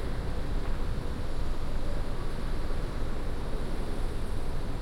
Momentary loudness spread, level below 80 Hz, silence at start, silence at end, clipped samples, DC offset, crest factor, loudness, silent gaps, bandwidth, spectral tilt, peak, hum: 1 LU; -30 dBFS; 0 s; 0 s; under 0.1%; under 0.1%; 10 dB; -37 LUFS; none; 11.5 kHz; -6.5 dB/octave; -18 dBFS; none